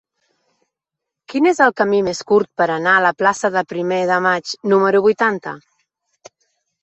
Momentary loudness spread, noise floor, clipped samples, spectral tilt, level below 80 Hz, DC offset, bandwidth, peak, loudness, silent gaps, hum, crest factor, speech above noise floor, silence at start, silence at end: 7 LU; -83 dBFS; under 0.1%; -5 dB/octave; -62 dBFS; under 0.1%; 8.4 kHz; -2 dBFS; -16 LUFS; none; none; 16 dB; 67 dB; 1.3 s; 1.25 s